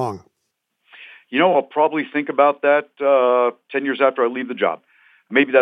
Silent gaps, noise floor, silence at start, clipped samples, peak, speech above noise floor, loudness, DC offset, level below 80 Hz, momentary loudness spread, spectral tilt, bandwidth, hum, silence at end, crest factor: none; -75 dBFS; 0 s; under 0.1%; -2 dBFS; 57 dB; -19 LUFS; under 0.1%; -78 dBFS; 9 LU; -6.5 dB/octave; 6 kHz; none; 0 s; 18 dB